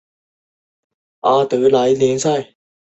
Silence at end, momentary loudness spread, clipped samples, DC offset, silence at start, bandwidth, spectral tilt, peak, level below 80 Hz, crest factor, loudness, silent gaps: 0.45 s; 7 LU; under 0.1%; under 0.1%; 1.25 s; 8.2 kHz; -5 dB/octave; -2 dBFS; -60 dBFS; 16 dB; -16 LUFS; none